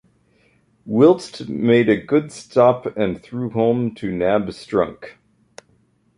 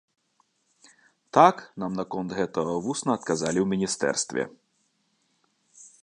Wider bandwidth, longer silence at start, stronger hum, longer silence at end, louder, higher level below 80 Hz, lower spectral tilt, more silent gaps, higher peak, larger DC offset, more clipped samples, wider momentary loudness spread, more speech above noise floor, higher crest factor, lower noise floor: about the same, 11 kHz vs 11 kHz; second, 0.85 s vs 1.35 s; neither; first, 1.05 s vs 0.15 s; first, -19 LUFS vs -26 LUFS; first, -54 dBFS vs -64 dBFS; first, -7 dB/octave vs -4.5 dB/octave; neither; about the same, -2 dBFS vs -2 dBFS; neither; neither; second, 10 LU vs 13 LU; second, 42 dB vs 46 dB; second, 18 dB vs 24 dB; second, -60 dBFS vs -71 dBFS